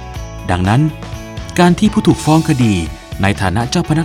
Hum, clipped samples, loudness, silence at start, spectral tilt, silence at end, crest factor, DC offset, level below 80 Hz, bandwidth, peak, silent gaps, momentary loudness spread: none; under 0.1%; -14 LUFS; 0 s; -6 dB/octave; 0 s; 14 dB; under 0.1%; -32 dBFS; 16 kHz; 0 dBFS; none; 15 LU